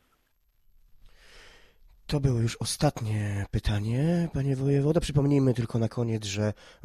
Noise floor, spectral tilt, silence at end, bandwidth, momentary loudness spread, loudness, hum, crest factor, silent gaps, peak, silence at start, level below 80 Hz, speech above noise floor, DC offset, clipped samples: -69 dBFS; -6.5 dB/octave; 0.3 s; 14.5 kHz; 6 LU; -27 LUFS; none; 18 dB; none; -10 dBFS; 1.35 s; -44 dBFS; 43 dB; under 0.1%; under 0.1%